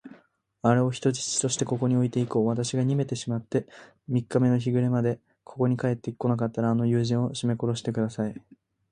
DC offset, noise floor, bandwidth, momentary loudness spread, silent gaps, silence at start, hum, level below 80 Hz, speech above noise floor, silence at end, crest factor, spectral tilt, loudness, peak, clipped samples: under 0.1%; -61 dBFS; 10 kHz; 7 LU; none; 0.05 s; none; -62 dBFS; 35 dB; 0.5 s; 20 dB; -6 dB/octave; -26 LUFS; -6 dBFS; under 0.1%